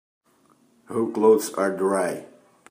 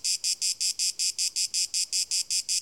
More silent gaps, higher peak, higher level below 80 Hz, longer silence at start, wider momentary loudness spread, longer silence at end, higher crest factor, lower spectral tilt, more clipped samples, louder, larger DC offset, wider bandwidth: neither; first, -6 dBFS vs -12 dBFS; second, -76 dBFS vs -70 dBFS; first, 0.9 s vs 0.05 s; first, 12 LU vs 1 LU; first, 0.45 s vs 0 s; about the same, 18 dB vs 16 dB; first, -5 dB/octave vs 5 dB/octave; neither; first, -22 LUFS vs -25 LUFS; neither; about the same, 15.5 kHz vs 17 kHz